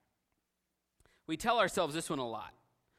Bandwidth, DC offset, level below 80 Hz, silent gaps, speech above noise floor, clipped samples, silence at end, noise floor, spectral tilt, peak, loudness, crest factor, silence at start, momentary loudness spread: 16 kHz; under 0.1%; -66 dBFS; none; 51 dB; under 0.1%; 0.5 s; -85 dBFS; -3.5 dB/octave; -16 dBFS; -34 LUFS; 22 dB; 1.3 s; 14 LU